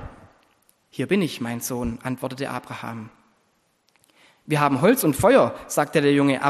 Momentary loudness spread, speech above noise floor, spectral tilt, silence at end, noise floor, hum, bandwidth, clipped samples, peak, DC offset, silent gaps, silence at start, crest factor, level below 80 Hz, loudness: 17 LU; 45 dB; -5.5 dB/octave; 0 s; -67 dBFS; none; 13 kHz; under 0.1%; -4 dBFS; under 0.1%; none; 0 s; 20 dB; -50 dBFS; -22 LUFS